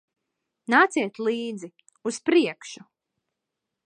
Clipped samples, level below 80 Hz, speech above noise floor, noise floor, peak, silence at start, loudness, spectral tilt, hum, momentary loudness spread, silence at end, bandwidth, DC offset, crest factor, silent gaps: under 0.1%; -80 dBFS; 60 dB; -84 dBFS; -6 dBFS; 0.7 s; -24 LUFS; -3.5 dB/octave; none; 22 LU; 1.1 s; 9.8 kHz; under 0.1%; 22 dB; none